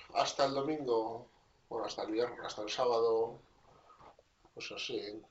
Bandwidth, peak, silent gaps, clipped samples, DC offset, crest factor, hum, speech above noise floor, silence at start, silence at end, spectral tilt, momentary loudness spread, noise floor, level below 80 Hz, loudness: 8 kHz; -16 dBFS; none; under 0.1%; under 0.1%; 22 dB; none; 28 dB; 0 s; 0.1 s; -2.5 dB/octave; 13 LU; -63 dBFS; -72 dBFS; -36 LUFS